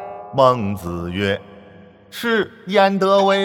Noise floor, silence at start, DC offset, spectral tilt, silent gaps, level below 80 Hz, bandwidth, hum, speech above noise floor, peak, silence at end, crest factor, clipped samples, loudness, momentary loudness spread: -44 dBFS; 0 s; under 0.1%; -6 dB/octave; none; -50 dBFS; 18.5 kHz; none; 27 dB; 0 dBFS; 0 s; 18 dB; under 0.1%; -19 LUFS; 11 LU